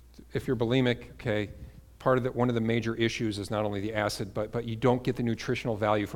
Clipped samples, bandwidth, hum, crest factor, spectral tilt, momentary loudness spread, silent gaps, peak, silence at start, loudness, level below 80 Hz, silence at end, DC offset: under 0.1%; 17 kHz; none; 18 dB; -6.5 dB/octave; 7 LU; none; -10 dBFS; 0.2 s; -29 LUFS; -52 dBFS; 0 s; under 0.1%